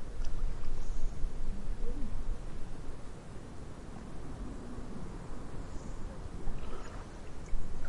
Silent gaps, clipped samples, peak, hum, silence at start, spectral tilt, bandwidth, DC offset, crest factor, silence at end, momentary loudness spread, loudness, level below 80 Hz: none; under 0.1%; -18 dBFS; none; 0 s; -6.5 dB/octave; 8 kHz; under 0.1%; 14 dB; 0 s; 6 LU; -45 LUFS; -36 dBFS